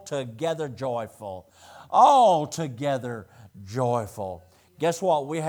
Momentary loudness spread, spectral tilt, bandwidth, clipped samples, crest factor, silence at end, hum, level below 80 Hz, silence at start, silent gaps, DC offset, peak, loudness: 20 LU; -5.5 dB/octave; over 20 kHz; under 0.1%; 20 dB; 0 s; none; -70 dBFS; 0.05 s; none; under 0.1%; -6 dBFS; -24 LUFS